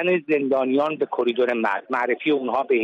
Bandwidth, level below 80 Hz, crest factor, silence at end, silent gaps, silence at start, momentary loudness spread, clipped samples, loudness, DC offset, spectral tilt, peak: 7 kHz; -72 dBFS; 12 dB; 0 s; none; 0 s; 3 LU; under 0.1%; -22 LUFS; under 0.1%; -7 dB/octave; -10 dBFS